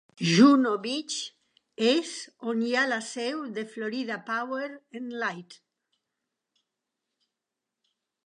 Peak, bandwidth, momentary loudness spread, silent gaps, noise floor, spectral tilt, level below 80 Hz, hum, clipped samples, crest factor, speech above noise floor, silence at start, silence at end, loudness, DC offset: -6 dBFS; 10.5 kHz; 18 LU; none; -87 dBFS; -4.5 dB/octave; -82 dBFS; none; under 0.1%; 22 dB; 60 dB; 0.2 s; 2.75 s; -26 LUFS; under 0.1%